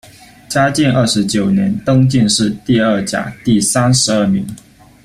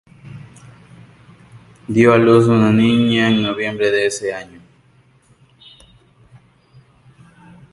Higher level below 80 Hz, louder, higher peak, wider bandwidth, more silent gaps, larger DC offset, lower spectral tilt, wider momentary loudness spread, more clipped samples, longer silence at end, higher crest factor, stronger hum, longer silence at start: first, -44 dBFS vs -52 dBFS; about the same, -13 LUFS vs -14 LUFS; about the same, -2 dBFS vs 0 dBFS; first, 15 kHz vs 11.5 kHz; neither; neither; second, -4.5 dB/octave vs -6 dB/octave; second, 7 LU vs 25 LU; neither; second, 0.5 s vs 3.3 s; second, 12 dB vs 18 dB; neither; first, 0.5 s vs 0.25 s